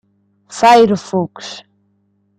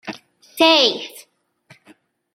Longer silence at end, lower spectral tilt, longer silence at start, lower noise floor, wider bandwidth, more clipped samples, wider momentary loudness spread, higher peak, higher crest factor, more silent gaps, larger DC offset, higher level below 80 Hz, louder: second, 0.8 s vs 1.15 s; first, -5 dB/octave vs -2 dB/octave; first, 0.5 s vs 0.05 s; first, -61 dBFS vs -56 dBFS; second, 14.5 kHz vs 16.5 kHz; neither; second, 22 LU vs 26 LU; about the same, 0 dBFS vs 0 dBFS; second, 16 dB vs 22 dB; neither; neither; first, -60 dBFS vs -70 dBFS; about the same, -12 LUFS vs -14 LUFS